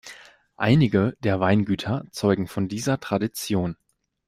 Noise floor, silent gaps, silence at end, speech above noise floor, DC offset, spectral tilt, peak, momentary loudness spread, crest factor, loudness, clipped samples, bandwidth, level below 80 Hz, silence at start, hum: -47 dBFS; none; 0.55 s; 24 dB; under 0.1%; -6.5 dB/octave; -6 dBFS; 9 LU; 18 dB; -23 LUFS; under 0.1%; 15.5 kHz; -54 dBFS; 0.05 s; none